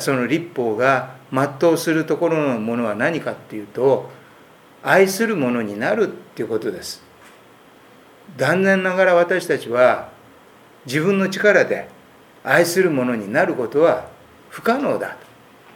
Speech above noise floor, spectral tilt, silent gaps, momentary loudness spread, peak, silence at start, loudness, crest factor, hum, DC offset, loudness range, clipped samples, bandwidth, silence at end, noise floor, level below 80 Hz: 29 dB; -5 dB/octave; none; 14 LU; 0 dBFS; 0 s; -19 LUFS; 20 dB; none; under 0.1%; 4 LU; under 0.1%; 18.5 kHz; 0.55 s; -48 dBFS; -66 dBFS